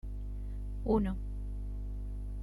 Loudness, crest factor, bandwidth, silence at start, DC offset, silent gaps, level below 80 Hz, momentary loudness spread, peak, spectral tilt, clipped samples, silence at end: -38 LUFS; 18 dB; 4.5 kHz; 0.05 s; under 0.1%; none; -38 dBFS; 11 LU; -18 dBFS; -10 dB/octave; under 0.1%; 0 s